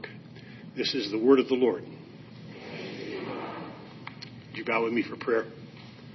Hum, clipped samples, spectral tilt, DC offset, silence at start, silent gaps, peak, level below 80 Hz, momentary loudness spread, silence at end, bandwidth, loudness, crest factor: none; under 0.1%; -6 dB/octave; under 0.1%; 0 s; none; -8 dBFS; -72 dBFS; 24 LU; 0 s; 6.2 kHz; -28 LUFS; 22 dB